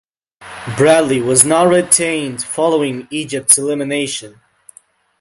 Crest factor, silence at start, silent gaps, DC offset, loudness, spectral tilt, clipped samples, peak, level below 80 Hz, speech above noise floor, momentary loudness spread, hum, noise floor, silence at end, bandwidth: 16 dB; 0.4 s; none; under 0.1%; -13 LUFS; -3 dB/octave; 0.1%; 0 dBFS; -54 dBFS; 35 dB; 13 LU; none; -49 dBFS; 0.9 s; 16 kHz